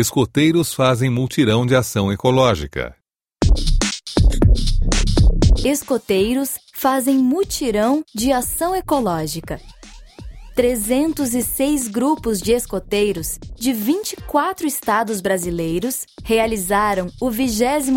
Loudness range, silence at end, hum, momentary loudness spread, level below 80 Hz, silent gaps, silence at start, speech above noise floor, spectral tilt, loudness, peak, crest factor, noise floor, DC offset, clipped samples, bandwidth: 3 LU; 0 s; none; 7 LU; -24 dBFS; none; 0 s; 21 dB; -5 dB/octave; -19 LUFS; 0 dBFS; 18 dB; -39 dBFS; under 0.1%; under 0.1%; 16.5 kHz